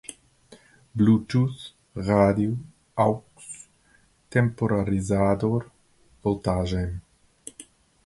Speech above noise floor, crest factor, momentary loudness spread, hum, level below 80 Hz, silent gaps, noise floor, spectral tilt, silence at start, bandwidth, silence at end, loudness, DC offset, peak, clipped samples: 38 dB; 20 dB; 20 LU; none; -44 dBFS; none; -61 dBFS; -7.5 dB/octave; 0.1 s; 11.5 kHz; 0.45 s; -24 LUFS; under 0.1%; -6 dBFS; under 0.1%